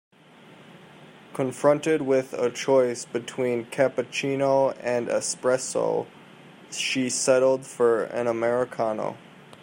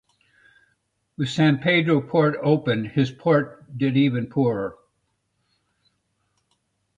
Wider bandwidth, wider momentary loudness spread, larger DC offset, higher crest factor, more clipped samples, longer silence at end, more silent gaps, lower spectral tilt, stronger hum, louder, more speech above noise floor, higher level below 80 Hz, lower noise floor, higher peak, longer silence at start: first, 16 kHz vs 9 kHz; about the same, 9 LU vs 9 LU; neither; about the same, 18 dB vs 18 dB; neither; second, 0.05 s vs 2.25 s; neither; second, -4 dB/octave vs -7.5 dB/octave; neither; about the same, -24 LUFS vs -22 LUFS; second, 27 dB vs 52 dB; second, -74 dBFS vs -62 dBFS; second, -51 dBFS vs -73 dBFS; about the same, -6 dBFS vs -6 dBFS; second, 0.75 s vs 1.2 s